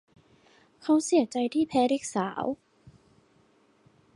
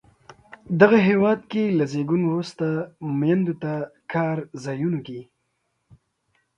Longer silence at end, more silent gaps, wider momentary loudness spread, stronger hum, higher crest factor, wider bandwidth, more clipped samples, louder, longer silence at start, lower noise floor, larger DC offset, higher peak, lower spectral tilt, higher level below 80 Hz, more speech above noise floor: first, 1.6 s vs 1.35 s; neither; second, 11 LU vs 14 LU; neither; about the same, 18 dB vs 22 dB; first, 11.5 kHz vs 9.4 kHz; neither; second, -27 LUFS vs -22 LUFS; first, 0.85 s vs 0.3 s; second, -64 dBFS vs -73 dBFS; neither; second, -12 dBFS vs 0 dBFS; second, -4.5 dB/octave vs -8 dB/octave; second, -70 dBFS vs -64 dBFS; second, 38 dB vs 52 dB